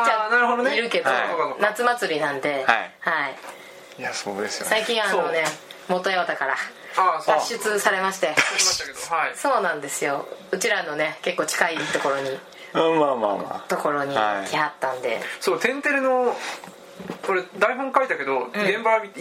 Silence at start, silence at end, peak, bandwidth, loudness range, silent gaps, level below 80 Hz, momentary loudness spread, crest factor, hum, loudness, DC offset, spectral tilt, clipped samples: 0 s; 0 s; -2 dBFS; 16 kHz; 3 LU; none; -70 dBFS; 10 LU; 22 dB; none; -23 LUFS; under 0.1%; -2 dB/octave; under 0.1%